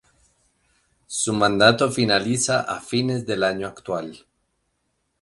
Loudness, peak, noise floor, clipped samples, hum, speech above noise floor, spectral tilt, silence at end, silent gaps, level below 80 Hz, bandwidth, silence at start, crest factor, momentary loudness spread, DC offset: -21 LUFS; 0 dBFS; -73 dBFS; under 0.1%; none; 51 dB; -3.5 dB/octave; 1.05 s; none; -58 dBFS; 11.5 kHz; 1.1 s; 22 dB; 14 LU; under 0.1%